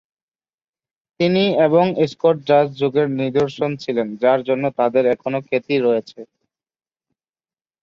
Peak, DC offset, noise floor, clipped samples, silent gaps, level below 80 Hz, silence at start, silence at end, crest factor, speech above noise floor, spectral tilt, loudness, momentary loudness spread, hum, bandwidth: -2 dBFS; under 0.1%; under -90 dBFS; under 0.1%; none; -64 dBFS; 1.2 s; 1.6 s; 16 dB; over 72 dB; -7.5 dB/octave; -18 LUFS; 7 LU; none; 7.4 kHz